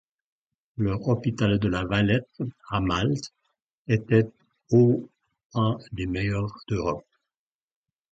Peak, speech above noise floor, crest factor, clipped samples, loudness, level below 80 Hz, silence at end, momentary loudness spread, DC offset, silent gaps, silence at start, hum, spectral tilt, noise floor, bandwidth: -8 dBFS; over 66 dB; 20 dB; under 0.1%; -26 LUFS; -46 dBFS; 1.1 s; 12 LU; under 0.1%; 3.64-3.69 s, 3.77-3.85 s, 5.44-5.50 s; 0.8 s; none; -7.5 dB/octave; under -90 dBFS; 7.8 kHz